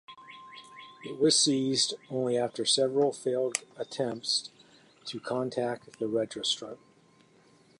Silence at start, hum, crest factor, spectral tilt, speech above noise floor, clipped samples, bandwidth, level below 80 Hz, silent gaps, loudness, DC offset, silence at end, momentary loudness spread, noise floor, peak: 0.1 s; none; 24 dB; -3 dB/octave; 32 dB; under 0.1%; 11.5 kHz; -78 dBFS; none; -29 LUFS; under 0.1%; 1.05 s; 22 LU; -62 dBFS; -6 dBFS